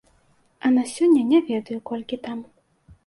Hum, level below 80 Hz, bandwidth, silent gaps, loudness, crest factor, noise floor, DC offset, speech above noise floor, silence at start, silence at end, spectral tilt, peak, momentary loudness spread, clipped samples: none; -62 dBFS; 11.5 kHz; none; -22 LUFS; 16 dB; -61 dBFS; under 0.1%; 40 dB; 0.65 s; 0.65 s; -5 dB/octave; -8 dBFS; 14 LU; under 0.1%